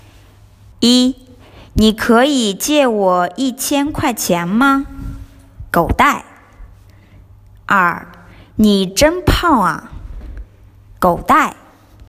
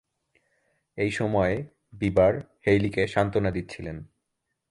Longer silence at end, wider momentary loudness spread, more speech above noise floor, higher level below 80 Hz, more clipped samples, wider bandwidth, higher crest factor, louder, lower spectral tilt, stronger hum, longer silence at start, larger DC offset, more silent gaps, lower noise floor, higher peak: second, 0.55 s vs 0.7 s; first, 19 LU vs 16 LU; second, 31 dB vs 56 dB; first, -32 dBFS vs -48 dBFS; neither; first, 16 kHz vs 11.5 kHz; about the same, 16 dB vs 18 dB; first, -14 LUFS vs -25 LUFS; second, -4 dB/octave vs -7 dB/octave; neither; second, 0.8 s vs 0.95 s; neither; neither; second, -44 dBFS vs -80 dBFS; first, 0 dBFS vs -8 dBFS